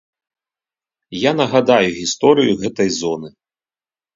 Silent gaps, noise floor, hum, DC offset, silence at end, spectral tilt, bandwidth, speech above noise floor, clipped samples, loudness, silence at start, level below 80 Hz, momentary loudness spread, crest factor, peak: none; under -90 dBFS; none; under 0.1%; 0.85 s; -4.5 dB/octave; 7.8 kHz; over 74 dB; under 0.1%; -16 LUFS; 1.1 s; -56 dBFS; 10 LU; 18 dB; 0 dBFS